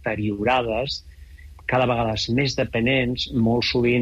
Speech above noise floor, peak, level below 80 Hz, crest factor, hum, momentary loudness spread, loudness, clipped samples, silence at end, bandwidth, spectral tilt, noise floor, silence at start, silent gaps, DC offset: 21 dB; -10 dBFS; -42 dBFS; 12 dB; none; 6 LU; -22 LUFS; under 0.1%; 0 s; 8 kHz; -6 dB/octave; -43 dBFS; 0 s; none; under 0.1%